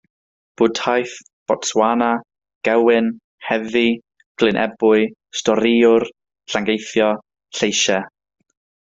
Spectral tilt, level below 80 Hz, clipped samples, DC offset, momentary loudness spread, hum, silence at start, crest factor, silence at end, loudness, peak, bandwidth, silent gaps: -3.5 dB/octave; -60 dBFS; under 0.1%; under 0.1%; 12 LU; none; 0.6 s; 18 dB; 0.75 s; -18 LUFS; -2 dBFS; 8 kHz; 1.33-1.46 s, 2.55-2.61 s, 3.24-3.38 s, 4.26-4.35 s